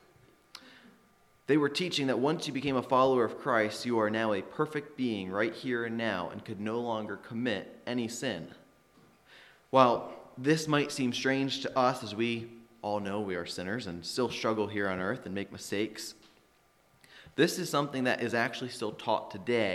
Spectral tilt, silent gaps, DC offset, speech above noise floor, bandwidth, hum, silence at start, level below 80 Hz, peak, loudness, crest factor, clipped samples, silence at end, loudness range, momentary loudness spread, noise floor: -5 dB/octave; none; under 0.1%; 36 dB; 15 kHz; none; 0.55 s; -72 dBFS; -8 dBFS; -31 LUFS; 24 dB; under 0.1%; 0 s; 6 LU; 11 LU; -66 dBFS